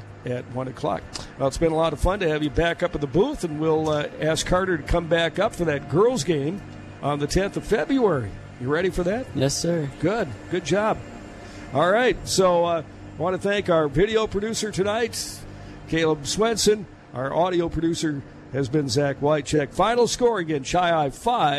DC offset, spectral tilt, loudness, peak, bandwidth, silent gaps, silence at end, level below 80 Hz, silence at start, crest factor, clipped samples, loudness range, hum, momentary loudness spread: under 0.1%; -5 dB/octave; -23 LUFS; -8 dBFS; 14 kHz; none; 0 s; -40 dBFS; 0 s; 16 dB; under 0.1%; 2 LU; none; 11 LU